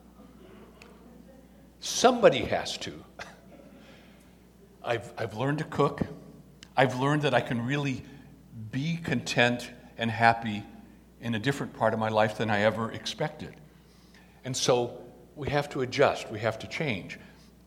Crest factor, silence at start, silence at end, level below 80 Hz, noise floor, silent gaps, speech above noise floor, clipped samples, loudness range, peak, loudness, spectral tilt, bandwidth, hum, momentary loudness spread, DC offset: 24 dB; 0.2 s; 0.35 s; -58 dBFS; -55 dBFS; none; 28 dB; under 0.1%; 5 LU; -6 dBFS; -28 LUFS; -4.5 dB/octave; 17 kHz; none; 20 LU; under 0.1%